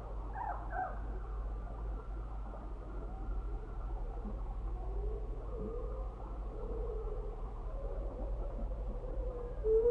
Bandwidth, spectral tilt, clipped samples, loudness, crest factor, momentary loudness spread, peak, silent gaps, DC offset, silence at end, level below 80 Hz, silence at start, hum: 3.6 kHz; -9.5 dB/octave; under 0.1%; -42 LUFS; 18 dB; 5 LU; -20 dBFS; none; under 0.1%; 0 s; -40 dBFS; 0 s; none